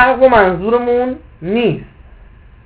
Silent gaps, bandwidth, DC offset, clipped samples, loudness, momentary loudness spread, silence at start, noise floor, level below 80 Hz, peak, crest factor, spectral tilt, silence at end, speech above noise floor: none; 4 kHz; under 0.1%; 0.2%; -13 LUFS; 14 LU; 0 s; -40 dBFS; -38 dBFS; 0 dBFS; 14 dB; -10 dB/octave; 0.8 s; 27 dB